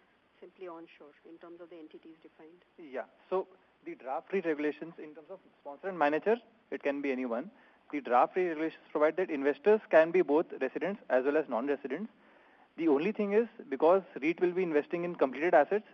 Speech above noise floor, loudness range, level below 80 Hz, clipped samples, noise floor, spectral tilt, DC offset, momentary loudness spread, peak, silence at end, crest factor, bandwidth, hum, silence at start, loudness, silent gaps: 30 dB; 13 LU; -84 dBFS; under 0.1%; -62 dBFS; -4.5 dB/octave; under 0.1%; 22 LU; -12 dBFS; 0.1 s; 20 dB; 6.4 kHz; none; 0.4 s; -31 LUFS; none